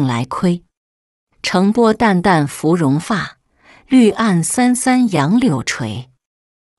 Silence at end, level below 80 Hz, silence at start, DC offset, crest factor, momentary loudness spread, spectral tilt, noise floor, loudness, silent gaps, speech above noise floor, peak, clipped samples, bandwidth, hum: 0.75 s; -50 dBFS; 0 s; under 0.1%; 14 dB; 10 LU; -5.5 dB/octave; -49 dBFS; -15 LUFS; 0.77-1.27 s; 35 dB; -2 dBFS; under 0.1%; 12 kHz; none